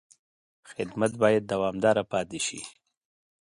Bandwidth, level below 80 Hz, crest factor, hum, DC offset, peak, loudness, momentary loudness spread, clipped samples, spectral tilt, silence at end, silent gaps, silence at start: 11.5 kHz; -62 dBFS; 20 dB; none; under 0.1%; -8 dBFS; -27 LUFS; 16 LU; under 0.1%; -4.5 dB/octave; 0.7 s; none; 0.7 s